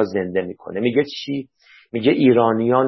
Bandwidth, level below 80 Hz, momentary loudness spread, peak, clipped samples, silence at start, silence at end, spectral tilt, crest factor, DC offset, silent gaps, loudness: 6 kHz; -58 dBFS; 14 LU; -2 dBFS; under 0.1%; 0 s; 0 s; -7.5 dB/octave; 16 dB; under 0.1%; none; -19 LUFS